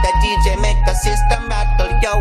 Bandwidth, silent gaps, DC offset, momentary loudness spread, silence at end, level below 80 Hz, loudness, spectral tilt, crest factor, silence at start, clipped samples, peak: 13 kHz; none; under 0.1%; 3 LU; 0 s; -16 dBFS; -17 LUFS; -4.5 dB/octave; 12 dB; 0 s; under 0.1%; -2 dBFS